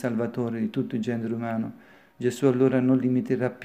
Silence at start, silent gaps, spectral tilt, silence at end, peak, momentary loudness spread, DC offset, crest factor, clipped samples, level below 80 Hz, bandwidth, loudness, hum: 0 s; none; -8 dB/octave; 0 s; -8 dBFS; 9 LU; under 0.1%; 18 dB; under 0.1%; -72 dBFS; 13 kHz; -26 LUFS; none